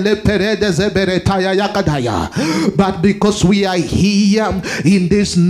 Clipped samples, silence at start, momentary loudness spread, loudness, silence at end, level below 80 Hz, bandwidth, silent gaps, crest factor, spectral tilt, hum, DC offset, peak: under 0.1%; 0 s; 4 LU; -14 LUFS; 0 s; -36 dBFS; 13 kHz; none; 14 dB; -5.5 dB/octave; none; under 0.1%; 0 dBFS